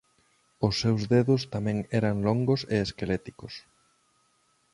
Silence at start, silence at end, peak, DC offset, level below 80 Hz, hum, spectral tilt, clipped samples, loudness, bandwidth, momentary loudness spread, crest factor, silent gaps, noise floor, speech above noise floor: 0.6 s; 1.15 s; -8 dBFS; under 0.1%; -52 dBFS; none; -6.5 dB/octave; under 0.1%; -27 LUFS; 11.5 kHz; 16 LU; 20 dB; none; -69 dBFS; 42 dB